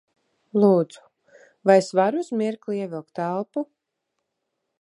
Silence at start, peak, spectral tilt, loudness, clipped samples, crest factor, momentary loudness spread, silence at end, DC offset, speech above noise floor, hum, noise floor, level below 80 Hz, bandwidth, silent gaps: 0.55 s; -4 dBFS; -7 dB/octave; -23 LUFS; under 0.1%; 20 dB; 14 LU; 1.15 s; under 0.1%; 58 dB; none; -80 dBFS; -78 dBFS; 11 kHz; none